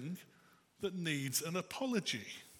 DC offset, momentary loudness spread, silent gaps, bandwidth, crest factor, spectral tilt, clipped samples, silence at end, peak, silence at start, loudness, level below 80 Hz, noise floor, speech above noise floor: under 0.1%; 9 LU; none; 17.5 kHz; 20 dB; -3.5 dB/octave; under 0.1%; 0 s; -20 dBFS; 0 s; -38 LUFS; -80 dBFS; -68 dBFS; 28 dB